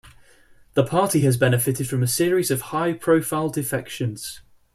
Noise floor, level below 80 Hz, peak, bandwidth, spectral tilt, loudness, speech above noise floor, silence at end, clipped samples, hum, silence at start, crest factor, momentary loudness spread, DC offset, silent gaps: -52 dBFS; -54 dBFS; -4 dBFS; 15.5 kHz; -5.5 dB/octave; -22 LUFS; 31 dB; 0.35 s; under 0.1%; none; 0.05 s; 18 dB; 9 LU; under 0.1%; none